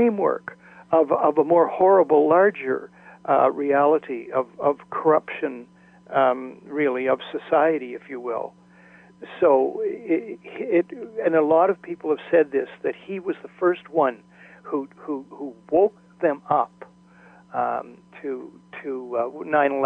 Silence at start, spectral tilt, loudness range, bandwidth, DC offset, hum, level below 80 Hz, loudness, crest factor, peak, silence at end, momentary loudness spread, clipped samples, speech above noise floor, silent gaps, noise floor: 0 s; -8.5 dB/octave; 7 LU; 3.9 kHz; under 0.1%; none; -72 dBFS; -22 LUFS; 16 dB; -6 dBFS; 0 s; 14 LU; under 0.1%; 29 dB; none; -51 dBFS